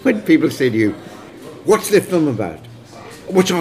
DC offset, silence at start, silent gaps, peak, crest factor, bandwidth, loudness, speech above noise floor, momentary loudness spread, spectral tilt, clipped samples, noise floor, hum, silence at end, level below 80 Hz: 0.1%; 0 s; none; 0 dBFS; 16 dB; 16 kHz; -17 LUFS; 22 dB; 22 LU; -5.5 dB/octave; under 0.1%; -37 dBFS; none; 0 s; -56 dBFS